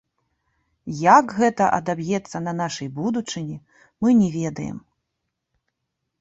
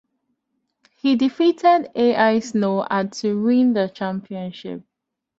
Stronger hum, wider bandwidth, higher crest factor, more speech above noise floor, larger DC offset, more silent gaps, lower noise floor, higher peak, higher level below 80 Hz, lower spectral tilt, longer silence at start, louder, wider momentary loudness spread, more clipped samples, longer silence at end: neither; about the same, 8 kHz vs 7.8 kHz; about the same, 22 dB vs 18 dB; about the same, 58 dB vs 55 dB; neither; neither; first, -79 dBFS vs -74 dBFS; first, 0 dBFS vs -4 dBFS; first, -60 dBFS vs -66 dBFS; about the same, -6 dB/octave vs -6 dB/octave; second, 0.85 s vs 1.05 s; about the same, -21 LUFS vs -19 LUFS; first, 18 LU vs 14 LU; neither; first, 1.4 s vs 0.6 s